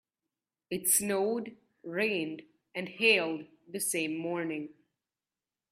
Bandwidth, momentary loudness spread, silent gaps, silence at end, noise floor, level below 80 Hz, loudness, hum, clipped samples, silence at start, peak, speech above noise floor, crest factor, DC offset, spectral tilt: 15.5 kHz; 18 LU; none; 1 s; under -90 dBFS; -76 dBFS; -30 LUFS; none; under 0.1%; 0.7 s; -12 dBFS; over 59 dB; 22 dB; under 0.1%; -2.5 dB/octave